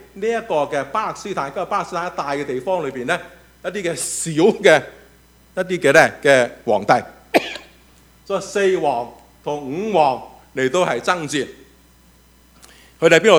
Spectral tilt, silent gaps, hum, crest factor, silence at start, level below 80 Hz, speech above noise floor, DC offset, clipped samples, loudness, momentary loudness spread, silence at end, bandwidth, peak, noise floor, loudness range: -4 dB/octave; none; none; 20 dB; 0.15 s; -54 dBFS; 33 dB; under 0.1%; under 0.1%; -19 LUFS; 14 LU; 0 s; over 20 kHz; 0 dBFS; -51 dBFS; 6 LU